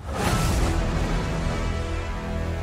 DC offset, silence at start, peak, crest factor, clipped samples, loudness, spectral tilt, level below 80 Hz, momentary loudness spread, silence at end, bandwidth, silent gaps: under 0.1%; 0 s; -10 dBFS; 16 dB; under 0.1%; -26 LUFS; -5.5 dB/octave; -28 dBFS; 7 LU; 0 s; 16 kHz; none